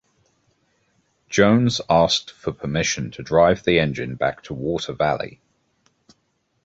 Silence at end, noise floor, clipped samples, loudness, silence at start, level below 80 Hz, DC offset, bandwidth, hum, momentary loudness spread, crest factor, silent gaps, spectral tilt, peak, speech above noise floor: 1.35 s; -69 dBFS; under 0.1%; -20 LUFS; 1.3 s; -48 dBFS; under 0.1%; 8 kHz; none; 11 LU; 20 dB; none; -5 dB/octave; -2 dBFS; 49 dB